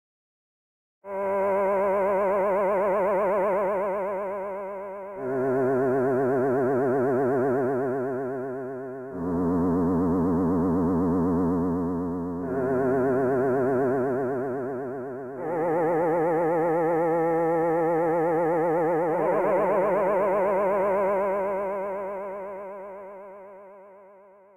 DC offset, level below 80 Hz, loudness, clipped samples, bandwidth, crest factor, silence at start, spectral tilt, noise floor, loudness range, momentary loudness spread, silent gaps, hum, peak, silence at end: 0.1%; -56 dBFS; -25 LUFS; under 0.1%; 15.5 kHz; 10 dB; 1.05 s; -9.5 dB/octave; -52 dBFS; 3 LU; 11 LU; none; none; -14 dBFS; 0.5 s